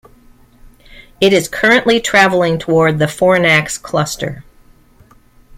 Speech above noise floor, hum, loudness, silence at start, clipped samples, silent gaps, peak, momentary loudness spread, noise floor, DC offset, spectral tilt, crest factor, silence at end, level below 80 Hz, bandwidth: 34 dB; none; -12 LUFS; 0.9 s; under 0.1%; none; 0 dBFS; 9 LU; -47 dBFS; under 0.1%; -4.5 dB/octave; 16 dB; 1.15 s; -44 dBFS; 16.5 kHz